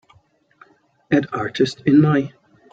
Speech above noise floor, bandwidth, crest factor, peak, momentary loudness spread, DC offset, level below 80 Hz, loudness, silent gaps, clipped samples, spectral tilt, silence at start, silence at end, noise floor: 41 dB; 7.8 kHz; 18 dB; -4 dBFS; 9 LU; under 0.1%; -58 dBFS; -18 LUFS; none; under 0.1%; -7.5 dB/octave; 1.1 s; 0.45 s; -58 dBFS